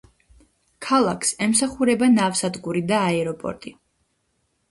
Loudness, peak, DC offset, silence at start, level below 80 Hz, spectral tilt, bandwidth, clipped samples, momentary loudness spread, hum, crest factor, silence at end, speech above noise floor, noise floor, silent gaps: -21 LUFS; -6 dBFS; under 0.1%; 0.8 s; -56 dBFS; -4 dB/octave; 12 kHz; under 0.1%; 14 LU; none; 16 dB; 1 s; 49 dB; -70 dBFS; none